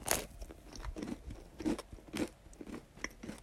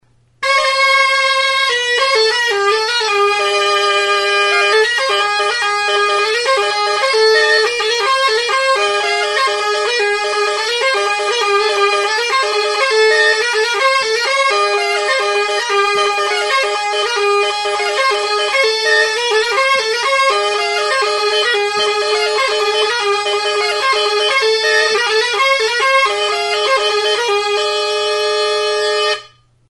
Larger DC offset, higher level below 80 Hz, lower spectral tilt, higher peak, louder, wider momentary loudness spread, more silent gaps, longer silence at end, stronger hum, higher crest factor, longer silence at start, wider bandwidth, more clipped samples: neither; first, -52 dBFS vs -62 dBFS; first, -3.5 dB/octave vs 0.5 dB/octave; second, -8 dBFS vs 0 dBFS; second, -43 LUFS vs -13 LUFS; first, 13 LU vs 4 LU; neither; second, 0 s vs 0.45 s; neither; first, 36 dB vs 14 dB; second, 0 s vs 0.4 s; first, 16 kHz vs 12 kHz; neither